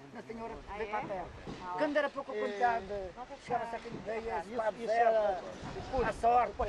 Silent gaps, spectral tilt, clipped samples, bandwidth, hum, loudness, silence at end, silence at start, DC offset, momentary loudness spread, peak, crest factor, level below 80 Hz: none; -5.5 dB/octave; under 0.1%; 11 kHz; none; -34 LUFS; 0 s; 0 s; under 0.1%; 15 LU; -16 dBFS; 18 dB; -54 dBFS